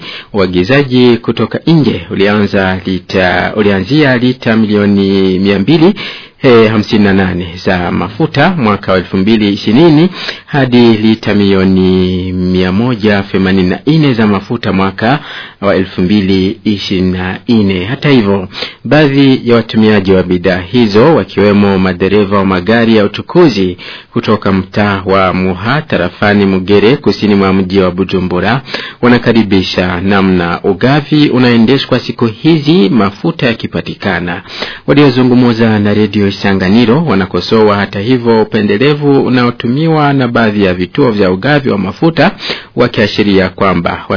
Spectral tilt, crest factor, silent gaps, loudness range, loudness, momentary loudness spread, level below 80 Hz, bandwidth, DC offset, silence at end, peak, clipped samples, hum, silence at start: -7.5 dB/octave; 8 dB; none; 2 LU; -9 LUFS; 6 LU; -40 dBFS; 5.4 kHz; under 0.1%; 0 s; 0 dBFS; 1%; none; 0 s